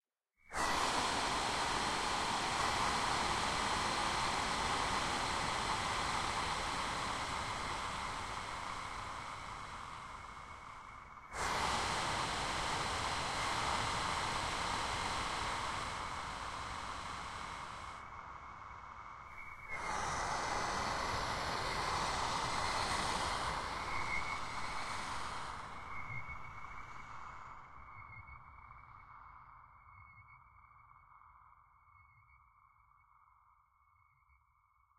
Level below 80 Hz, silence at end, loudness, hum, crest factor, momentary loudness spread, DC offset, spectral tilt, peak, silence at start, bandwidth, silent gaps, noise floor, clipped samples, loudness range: -54 dBFS; 2.6 s; -38 LUFS; none; 18 dB; 16 LU; under 0.1%; -2.5 dB/octave; -22 dBFS; 0.45 s; 16 kHz; none; -73 dBFS; under 0.1%; 15 LU